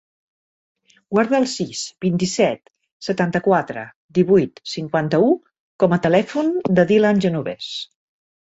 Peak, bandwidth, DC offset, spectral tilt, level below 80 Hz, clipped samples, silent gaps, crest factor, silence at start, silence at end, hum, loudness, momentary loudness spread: -2 dBFS; 8.2 kHz; under 0.1%; -6 dB/octave; -58 dBFS; under 0.1%; 2.92-3.00 s, 3.96-4.09 s, 5.60-5.79 s; 18 dB; 1.1 s; 0.65 s; none; -19 LUFS; 13 LU